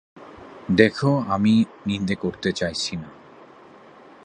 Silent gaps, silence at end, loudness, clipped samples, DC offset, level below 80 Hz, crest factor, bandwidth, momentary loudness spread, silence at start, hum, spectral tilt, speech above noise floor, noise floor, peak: none; 1.1 s; -22 LUFS; under 0.1%; under 0.1%; -52 dBFS; 22 dB; 10 kHz; 22 LU; 0.15 s; none; -6 dB/octave; 26 dB; -47 dBFS; 0 dBFS